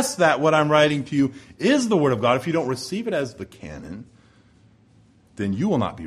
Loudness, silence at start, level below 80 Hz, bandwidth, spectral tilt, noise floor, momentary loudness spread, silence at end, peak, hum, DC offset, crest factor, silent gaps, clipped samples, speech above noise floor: -21 LUFS; 0 s; -56 dBFS; 15 kHz; -5 dB/octave; -55 dBFS; 19 LU; 0 s; -2 dBFS; none; under 0.1%; 20 dB; none; under 0.1%; 34 dB